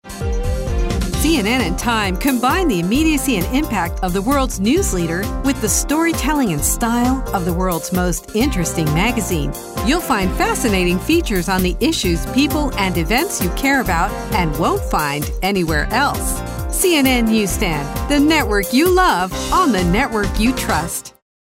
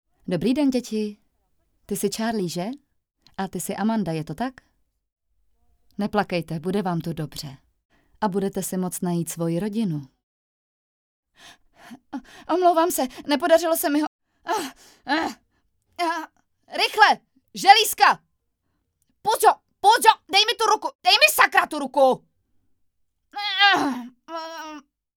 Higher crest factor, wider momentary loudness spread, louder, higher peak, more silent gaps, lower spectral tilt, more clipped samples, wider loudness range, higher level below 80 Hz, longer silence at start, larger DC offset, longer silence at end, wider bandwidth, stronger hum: second, 14 dB vs 24 dB; second, 6 LU vs 19 LU; first, -17 LUFS vs -21 LUFS; about the same, -2 dBFS vs 0 dBFS; second, none vs 5.12-5.16 s, 7.85-7.89 s, 10.23-11.23 s, 14.07-14.19 s, 20.95-20.99 s; about the same, -4.5 dB/octave vs -3.5 dB/octave; neither; second, 2 LU vs 11 LU; first, -26 dBFS vs -60 dBFS; second, 0.05 s vs 0.3 s; neither; about the same, 0.4 s vs 0.35 s; second, 16 kHz vs over 20 kHz; neither